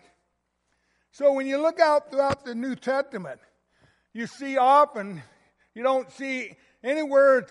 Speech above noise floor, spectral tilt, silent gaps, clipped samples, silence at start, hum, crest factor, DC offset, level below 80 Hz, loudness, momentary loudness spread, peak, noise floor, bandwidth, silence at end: 52 dB; -5 dB/octave; none; under 0.1%; 1.2 s; none; 20 dB; under 0.1%; -68 dBFS; -24 LUFS; 18 LU; -4 dBFS; -75 dBFS; 11.5 kHz; 0.05 s